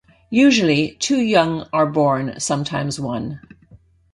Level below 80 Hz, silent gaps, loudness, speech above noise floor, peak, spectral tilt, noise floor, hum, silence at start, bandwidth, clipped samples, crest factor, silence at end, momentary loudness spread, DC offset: -52 dBFS; none; -18 LUFS; 32 dB; -2 dBFS; -5 dB/octave; -50 dBFS; none; 0.3 s; 11.5 kHz; under 0.1%; 18 dB; 0.4 s; 11 LU; under 0.1%